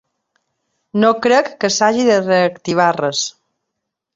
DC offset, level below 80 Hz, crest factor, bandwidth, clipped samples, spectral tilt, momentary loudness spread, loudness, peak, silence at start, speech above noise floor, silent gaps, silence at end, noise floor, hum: under 0.1%; -62 dBFS; 16 dB; 8 kHz; under 0.1%; -4 dB/octave; 7 LU; -15 LUFS; -2 dBFS; 0.95 s; 63 dB; none; 0.85 s; -78 dBFS; none